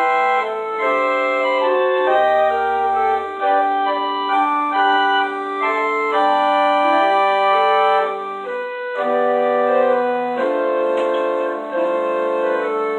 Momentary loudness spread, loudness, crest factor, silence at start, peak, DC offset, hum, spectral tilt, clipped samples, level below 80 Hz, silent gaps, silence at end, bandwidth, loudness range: 6 LU; -17 LUFS; 12 dB; 0 s; -4 dBFS; under 0.1%; none; -4 dB/octave; under 0.1%; -62 dBFS; none; 0 s; 8.8 kHz; 2 LU